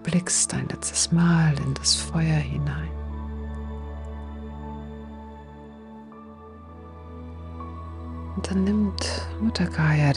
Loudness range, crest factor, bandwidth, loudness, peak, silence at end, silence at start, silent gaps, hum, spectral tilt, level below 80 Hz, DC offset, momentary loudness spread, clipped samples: 17 LU; 20 dB; 11.5 kHz; -24 LUFS; -6 dBFS; 0 s; 0 s; none; none; -4.5 dB/octave; -38 dBFS; under 0.1%; 22 LU; under 0.1%